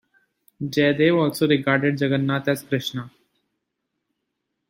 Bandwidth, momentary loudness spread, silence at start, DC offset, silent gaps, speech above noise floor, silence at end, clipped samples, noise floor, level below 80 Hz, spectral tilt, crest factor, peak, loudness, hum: 16.5 kHz; 13 LU; 0.6 s; under 0.1%; none; 58 dB; 1.6 s; under 0.1%; -79 dBFS; -64 dBFS; -6 dB/octave; 20 dB; -4 dBFS; -21 LUFS; none